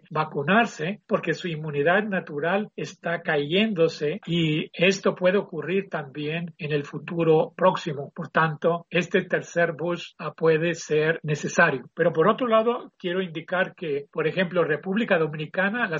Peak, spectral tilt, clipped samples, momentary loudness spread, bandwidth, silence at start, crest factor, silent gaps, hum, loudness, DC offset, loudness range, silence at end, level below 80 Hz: -4 dBFS; -4 dB/octave; under 0.1%; 9 LU; 7.6 kHz; 0.1 s; 20 dB; none; none; -24 LUFS; under 0.1%; 2 LU; 0 s; -68 dBFS